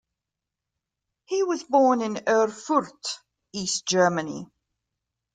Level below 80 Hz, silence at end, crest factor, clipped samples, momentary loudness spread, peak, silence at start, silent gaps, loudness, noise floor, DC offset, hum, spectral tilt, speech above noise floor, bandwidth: -70 dBFS; 0.9 s; 18 dB; under 0.1%; 14 LU; -8 dBFS; 1.3 s; none; -24 LUFS; -86 dBFS; under 0.1%; none; -3.5 dB/octave; 63 dB; 9.6 kHz